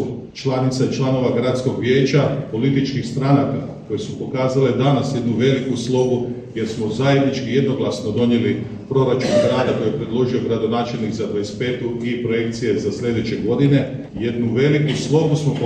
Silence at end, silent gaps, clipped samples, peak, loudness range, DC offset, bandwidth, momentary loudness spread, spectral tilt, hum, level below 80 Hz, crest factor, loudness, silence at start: 0 s; none; under 0.1%; -2 dBFS; 2 LU; under 0.1%; 9.2 kHz; 7 LU; -7 dB/octave; none; -50 dBFS; 16 dB; -19 LUFS; 0 s